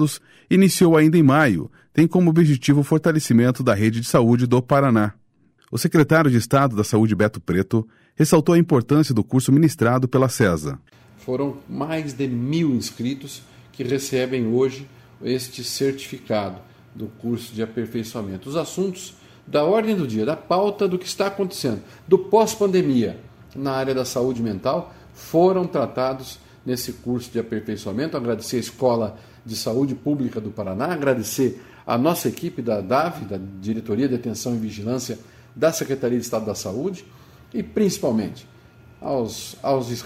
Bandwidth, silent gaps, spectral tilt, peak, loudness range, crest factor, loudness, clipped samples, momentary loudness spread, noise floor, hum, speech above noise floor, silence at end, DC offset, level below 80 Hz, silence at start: 16 kHz; none; -6 dB/octave; -4 dBFS; 8 LU; 18 dB; -21 LUFS; under 0.1%; 14 LU; -58 dBFS; none; 38 dB; 0 s; under 0.1%; -54 dBFS; 0 s